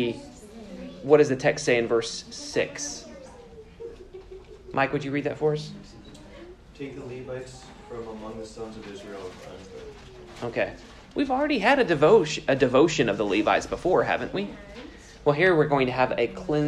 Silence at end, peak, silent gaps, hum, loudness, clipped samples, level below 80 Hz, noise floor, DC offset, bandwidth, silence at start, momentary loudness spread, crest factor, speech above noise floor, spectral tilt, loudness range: 0 s; -4 dBFS; none; none; -24 LUFS; under 0.1%; -52 dBFS; -46 dBFS; under 0.1%; 11 kHz; 0 s; 24 LU; 22 dB; 22 dB; -5 dB/octave; 17 LU